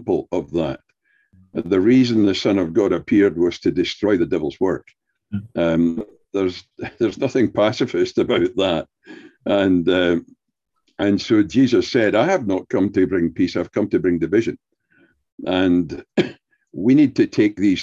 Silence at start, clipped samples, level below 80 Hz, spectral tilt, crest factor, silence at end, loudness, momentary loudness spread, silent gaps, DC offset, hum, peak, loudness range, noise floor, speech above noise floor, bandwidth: 0 s; under 0.1%; -48 dBFS; -6.5 dB/octave; 16 dB; 0 s; -19 LUFS; 12 LU; 15.32-15.38 s; under 0.1%; none; -4 dBFS; 4 LU; -76 dBFS; 57 dB; 7.6 kHz